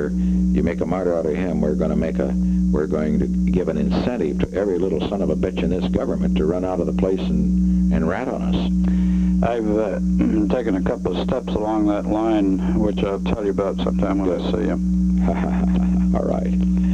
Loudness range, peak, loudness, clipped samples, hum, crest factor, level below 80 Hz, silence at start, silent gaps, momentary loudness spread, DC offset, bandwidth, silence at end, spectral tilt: 1 LU; -4 dBFS; -20 LUFS; under 0.1%; none; 16 dB; -30 dBFS; 0 s; none; 3 LU; 0.3%; 7.8 kHz; 0 s; -8.5 dB/octave